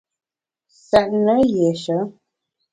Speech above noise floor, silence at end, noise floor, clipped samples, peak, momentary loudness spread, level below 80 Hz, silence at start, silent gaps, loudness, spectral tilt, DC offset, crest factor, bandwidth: 59 dB; 0.6 s; -76 dBFS; under 0.1%; -2 dBFS; 8 LU; -52 dBFS; 0.9 s; none; -18 LUFS; -6.5 dB/octave; under 0.1%; 20 dB; 11 kHz